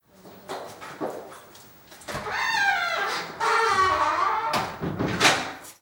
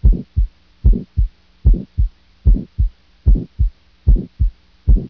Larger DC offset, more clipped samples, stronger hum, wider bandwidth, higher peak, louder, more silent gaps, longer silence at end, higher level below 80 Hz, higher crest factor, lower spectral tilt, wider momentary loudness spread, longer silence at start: neither; neither; neither; first, over 20 kHz vs 1 kHz; about the same, -4 dBFS vs -2 dBFS; second, -24 LUFS vs -20 LUFS; neither; about the same, 0.1 s vs 0 s; second, -56 dBFS vs -16 dBFS; first, 22 dB vs 14 dB; second, -2.5 dB/octave vs -12 dB/octave; first, 18 LU vs 5 LU; first, 0.25 s vs 0 s